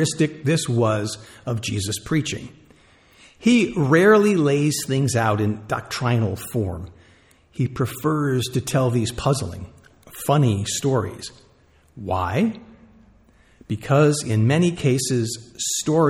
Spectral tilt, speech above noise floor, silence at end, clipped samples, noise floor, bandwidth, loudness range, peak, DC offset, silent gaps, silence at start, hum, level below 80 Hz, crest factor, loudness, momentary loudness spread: -5.5 dB/octave; 35 dB; 0 s; under 0.1%; -56 dBFS; 18 kHz; 6 LU; -4 dBFS; under 0.1%; none; 0 s; none; -50 dBFS; 18 dB; -21 LUFS; 14 LU